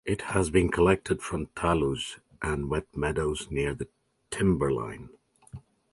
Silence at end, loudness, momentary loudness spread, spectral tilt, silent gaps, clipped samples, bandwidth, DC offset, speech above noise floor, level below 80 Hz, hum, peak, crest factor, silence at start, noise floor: 0.35 s; -28 LUFS; 17 LU; -5.5 dB/octave; none; under 0.1%; 11.5 kHz; under 0.1%; 21 dB; -42 dBFS; none; -8 dBFS; 20 dB; 0.05 s; -48 dBFS